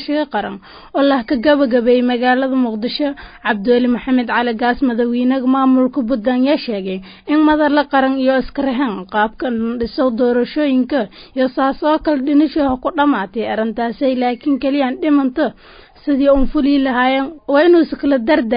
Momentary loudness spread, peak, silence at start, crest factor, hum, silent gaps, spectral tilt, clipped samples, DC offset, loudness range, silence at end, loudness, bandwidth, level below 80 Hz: 7 LU; -2 dBFS; 0 s; 12 dB; none; none; -10.5 dB/octave; under 0.1%; under 0.1%; 2 LU; 0 s; -16 LUFS; 5.2 kHz; -40 dBFS